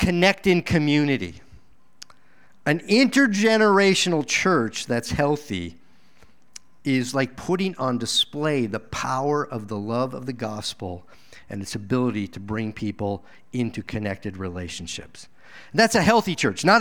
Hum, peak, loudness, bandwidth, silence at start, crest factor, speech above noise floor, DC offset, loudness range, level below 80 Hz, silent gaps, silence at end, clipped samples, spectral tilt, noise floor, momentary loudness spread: none; -2 dBFS; -23 LUFS; 19 kHz; 0 s; 22 dB; 37 dB; 0.5%; 9 LU; -48 dBFS; none; 0 s; under 0.1%; -4.5 dB/octave; -59 dBFS; 14 LU